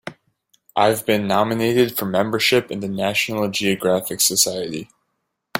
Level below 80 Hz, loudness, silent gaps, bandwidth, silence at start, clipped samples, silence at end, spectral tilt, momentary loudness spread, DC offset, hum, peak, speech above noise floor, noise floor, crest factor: -58 dBFS; -19 LUFS; none; 17 kHz; 0.05 s; under 0.1%; 0 s; -3 dB/octave; 10 LU; under 0.1%; none; -2 dBFS; 55 dB; -75 dBFS; 18 dB